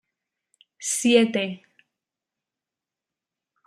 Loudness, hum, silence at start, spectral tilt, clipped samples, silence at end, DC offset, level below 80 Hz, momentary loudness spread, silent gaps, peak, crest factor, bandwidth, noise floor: -22 LUFS; none; 0.8 s; -3 dB/octave; under 0.1%; 2.1 s; under 0.1%; -74 dBFS; 14 LU; none; -4 dBFS; 22 dB; 14.5 kHz; -89 dBFS